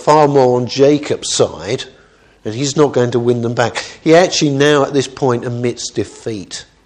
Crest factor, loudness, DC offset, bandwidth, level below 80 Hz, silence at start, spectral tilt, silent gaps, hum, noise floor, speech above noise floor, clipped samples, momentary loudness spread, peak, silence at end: 14 dB; -14 LUFS; under 0.1%; 10.5 kHz; -52 dBFS; 0 s; -5 dB/octave; none; none; -41 dBFS; 27 dB; under 0.1%; 14 LU; 0 dBFS; 0.2 s